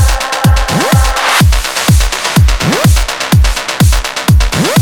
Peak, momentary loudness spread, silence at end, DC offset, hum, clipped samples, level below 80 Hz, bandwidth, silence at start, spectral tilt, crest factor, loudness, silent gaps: 0 dBFS; 3 LU; 0 s; 1%; none; under 0.1%; -14 dBFS; 19.5 kHz; 0 s; -4.5 dB/octave; 10 dB; -10 LUFS; none